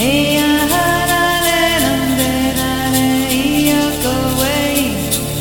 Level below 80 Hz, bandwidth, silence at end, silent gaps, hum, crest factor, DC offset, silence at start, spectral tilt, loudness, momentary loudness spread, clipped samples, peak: -32 dBFS; 17.5 kHz; 0 s; none; none; 14 dB; under 0.1%; 0 s; -3.5 dB/octave; -14 LUFS; 3 LU; under 0.1%; 0 dBFS